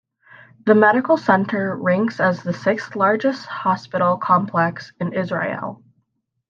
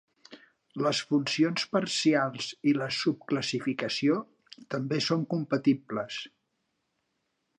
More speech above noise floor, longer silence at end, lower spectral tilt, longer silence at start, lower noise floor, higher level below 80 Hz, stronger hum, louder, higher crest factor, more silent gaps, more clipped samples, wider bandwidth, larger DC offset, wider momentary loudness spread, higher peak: about the same, 53 dB vs 50 dB; second, 0.75 s vs 1.3 s; first, -7.5 dB/octave vs -5 dB/octave; first, 0.65 s vs 0.3 s; second, -71 dBFS vs -79 dBFS; first, -70 dBFS vs -76 dBFS; neither; first, -19 LUFS vs -29 LUFS; about the same, 18 dB vs 18 dB; neither; neither; second, 7.4 kHz vs 10.5 kHz; neither; about the same, 10 LU vs 10 LU; first, -2 dBFS vs -12 dBFS